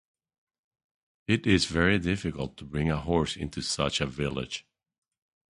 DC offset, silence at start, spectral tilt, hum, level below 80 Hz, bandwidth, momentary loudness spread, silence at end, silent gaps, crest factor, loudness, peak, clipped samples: under 0.1%; 1.3 s; -5 dB/octave; none; -46 dBFS; 11.5 kHz; 12 LU; 0.9 s; none; 22 dB; -28 LUFS; -8 dBFS; under 0.1%